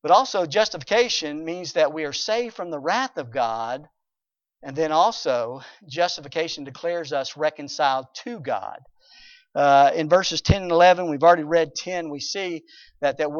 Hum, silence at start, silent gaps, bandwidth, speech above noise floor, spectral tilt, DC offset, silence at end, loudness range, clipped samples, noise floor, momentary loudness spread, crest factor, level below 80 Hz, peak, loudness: none; 0.05 s; none; 7.2 kHz; 66 dB; -4 dB/octave; under 0.1%; 0 s; 7 LU; under 0.1%; -88 dBFS; 14 LU; 20 dB; -46 dBFS; -4 dBFS; -22 LUFS